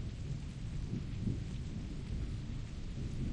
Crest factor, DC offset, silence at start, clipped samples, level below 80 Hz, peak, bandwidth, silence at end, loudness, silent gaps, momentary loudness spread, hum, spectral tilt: 14 dB; under 0.1%; 0 s; under 0.1%; -44 dBFS; -26 dBFS; 10 kHz; 0 s; -42 LUFS; none; 4 LU; none; -7 dB/octave